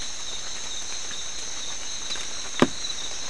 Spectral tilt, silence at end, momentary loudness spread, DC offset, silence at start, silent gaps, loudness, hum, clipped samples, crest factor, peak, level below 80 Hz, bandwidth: -2 dB/octave; 0 s; 7 LU; 3%; 0 s; none; -29 LUFS; none; under 0.1%; 28 dB; -4 dBFS; -52 dBFS; 12 kHz